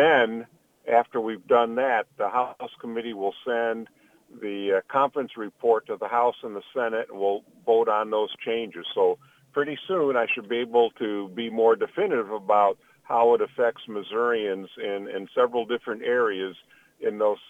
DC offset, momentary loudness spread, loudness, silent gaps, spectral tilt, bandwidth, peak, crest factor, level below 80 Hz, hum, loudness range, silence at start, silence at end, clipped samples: under 0.1%; 11 LU; -25 LUFS; none; -6 dB/octave; 3.8 kHz; -6 dBFS; 20 dB; -72 dBFS; none; 4 LU; 0 s; 0.15 s; under 0.1%